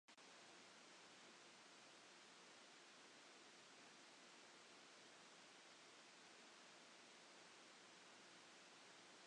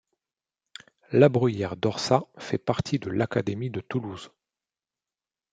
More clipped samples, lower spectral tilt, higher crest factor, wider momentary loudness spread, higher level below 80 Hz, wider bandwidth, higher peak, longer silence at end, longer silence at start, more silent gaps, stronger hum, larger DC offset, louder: neither; second, -1 dB/octave vs -6.5 dB/octave; second, 14 dB vs 24 dB; second, 0 LU vs 12 LU; second, under -90 dBFS vs -62 dBFS; first, 10.5 kHz vs 9.2 kHz; second, -52 dBFS vs -4 dBFS; second, 0 s vs 1.25 s; second, 0.1 s vs 1.1 s; neither; neither; neither; second, -64 LUFS vs -26 LUFS